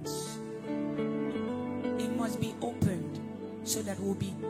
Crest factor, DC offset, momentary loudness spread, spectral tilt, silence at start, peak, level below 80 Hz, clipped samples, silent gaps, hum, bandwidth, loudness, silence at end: 18 dB; under 0.1%; 7 LU; -5.5 dB/octave; 0 s; -14 dBFS; -62 dBFS; under 0.1%; none; none; 16 kHz; -34 LUFS; 0 s